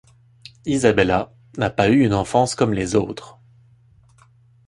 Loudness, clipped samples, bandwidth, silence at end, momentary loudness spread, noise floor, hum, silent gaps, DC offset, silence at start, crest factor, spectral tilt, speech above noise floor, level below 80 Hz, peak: -19 LUFS; under 0.1%; 11.5 kHz; 1.35 s; 14 LU; -53 dBFS; none; none; under 0.1%; 0.65 s; 20 dB; -5.5 dB/octave; 35 dB; -44 dBFS; 0 dBFS